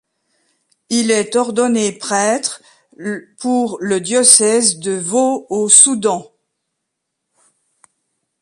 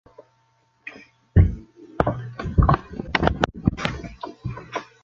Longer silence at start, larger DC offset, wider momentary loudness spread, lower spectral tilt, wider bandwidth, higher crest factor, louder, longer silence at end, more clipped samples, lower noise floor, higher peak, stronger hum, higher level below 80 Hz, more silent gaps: first, 0.9 s vs 0.2 s; neither; second, 17 LU vs 20 LU; second, -2 dB/octave vs -7.5 dB/octave; first, 16 kHz vs 7.4 kHz; second, 18 dB vs 24 dB; first, -13 LUFS vs -24 LUFS; first, 2.2 s vs 0.2 s; first, 0.1% vs under 0.1%; first, -76 dBFS vs -64 dBFS; about the same, 0 dBFS vs 0 dBFS; neither; second, -64 dBFS vs -30 dBFS; neither